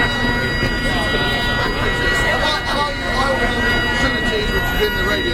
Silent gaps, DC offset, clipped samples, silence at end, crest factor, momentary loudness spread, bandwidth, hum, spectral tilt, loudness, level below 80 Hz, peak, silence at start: none; under 0.1%; under 0.1%; 0 s; 14 dB; 2 LU; 16 kHz; none; -4.5 dB/octave; -17 LUFS; -26 dBFS; -2 dBFS; 0 s